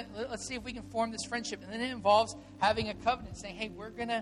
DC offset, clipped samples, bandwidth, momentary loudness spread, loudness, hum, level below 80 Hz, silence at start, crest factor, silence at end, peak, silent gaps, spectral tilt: under 0.1%; under 0.1%; 12 kHz; 13 LU; -33 LUFS; none; -56 dBFS; 0 s; 20 dB; 0 s; -14 dBFS; none; -3.5 dB/octave